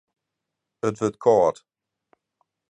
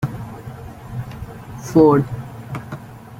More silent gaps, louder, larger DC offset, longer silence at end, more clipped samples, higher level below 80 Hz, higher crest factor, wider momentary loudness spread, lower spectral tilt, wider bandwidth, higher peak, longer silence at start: neither; second, -22 LUFS vs -18 LUFS; neither; first, 1.2 s vs 0 s; neither; second, -62 dBFS vs -44 dBFS; about the same, 20 dB vs 20 dB; second, 10 LU vs 21 LU; second, -6.5 dB/octave vs -8.5 dB/octave; second, 10.5 kHz vs 16 kHz; second, -6 dBFS vs -2 dBFS; first, 0.85 s vs 0 s